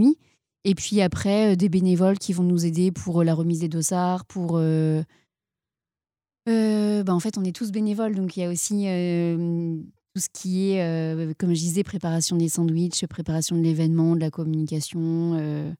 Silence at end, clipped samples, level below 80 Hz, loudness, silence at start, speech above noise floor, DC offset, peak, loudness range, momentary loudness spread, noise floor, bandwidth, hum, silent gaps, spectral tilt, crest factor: 0.05 s; under 0.1%; -58 dBFS; -24 LUFS; 0 s; over 67 dB; under 0.1%; -10 dBFS; 4 LU; 7 LU; under -90 dBFS; 16 kHz; none; none; -6 dB/octave; 14 dB